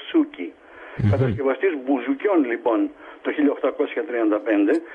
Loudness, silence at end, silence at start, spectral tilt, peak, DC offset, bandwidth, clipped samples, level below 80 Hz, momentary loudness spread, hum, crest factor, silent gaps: -22 LUFS; 0 s; 0 s; -9.5 dB/octave; -8 dBFS; under 0.1%; 5 kHz; under 0.1%; -52 dBFS; 8 LU; none; 14 dB; none